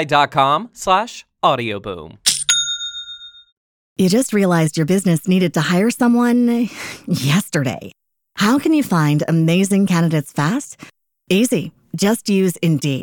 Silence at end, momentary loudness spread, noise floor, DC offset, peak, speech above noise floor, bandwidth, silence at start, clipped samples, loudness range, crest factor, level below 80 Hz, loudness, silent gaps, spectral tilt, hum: 0 s; 11 LU; -37 dBFS; under 0.1%; 0 dBFS; 20 dB; 17.5 kHz; 0 s; under 0.1%; 2 LU; 16 dB; -56 dBFS; -17 LUFS; 3.52-3.96 s; -5 dB/octave; none